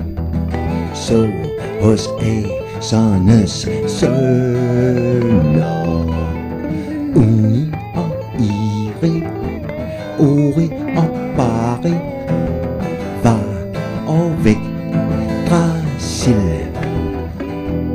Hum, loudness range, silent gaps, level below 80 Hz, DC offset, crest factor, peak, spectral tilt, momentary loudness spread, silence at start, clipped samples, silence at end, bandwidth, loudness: none; 3 LU; none; -32 dBFS; under 0.1%; 14 dB; -2 dBFS; -7 dB/octave; 9 LU; 0 s; under 0.1%; 0 s; 15 kHz; -17 LUFS